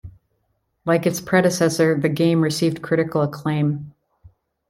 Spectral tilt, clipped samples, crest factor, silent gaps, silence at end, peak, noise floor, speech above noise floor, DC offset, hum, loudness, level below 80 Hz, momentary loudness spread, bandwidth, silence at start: -6 dB/octave; under 0.1%; 18 dB; none; 0.8 s; -4 dBFS; -70 dBFS; 51 dB; under 0.1%; none; -20 LUFS; -56 dBFS; 5 LU; 16.5 kHz; 0.05 s